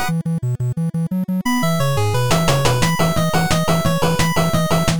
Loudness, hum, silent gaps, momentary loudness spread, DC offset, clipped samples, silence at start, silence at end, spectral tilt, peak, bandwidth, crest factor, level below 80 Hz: -18 LUFS; none; none; 5 LU; 5%; under 0.1%; 0 s; 0 s; -5 dB/octave; -2 dBFS; over 20 kHz; 14 dB; -36 dBFS